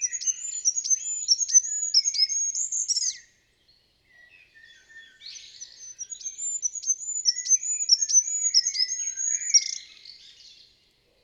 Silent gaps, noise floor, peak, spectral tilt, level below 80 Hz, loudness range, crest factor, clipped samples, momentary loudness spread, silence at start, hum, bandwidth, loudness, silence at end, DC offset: none; -64 dBFS; -8 dBFS; 6.5 dB/octave; -76 dBFS; 13 LU; 20 dB; under 0.1%; 21 LU; 0 s; none; 11.5 kHz; -22 LUFS; 0.75 s; under 0.1%